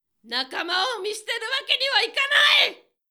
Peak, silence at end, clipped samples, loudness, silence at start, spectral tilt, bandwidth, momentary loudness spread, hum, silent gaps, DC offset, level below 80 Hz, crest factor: -4 dBFS; 0.35 s; under 0.1%; -21 LUFS; 0.25 s; 1.5 dB/octave; 20 kHz; 12 LU; none; none; under 0.1%; -88 dBFS; 20 dB